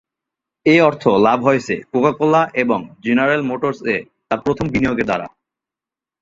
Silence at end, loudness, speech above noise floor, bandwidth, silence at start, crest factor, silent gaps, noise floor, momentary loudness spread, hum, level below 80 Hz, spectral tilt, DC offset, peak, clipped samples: 0.95 s; -17 LUFS; 72 dB; 7.8 kHz; 0.65 s; 16 dB; none; -88 dBFS; 9 LU; none; -50 dBFS; -6.5 dB/octave; under 0.1%; -2 dBFS; under 0.1%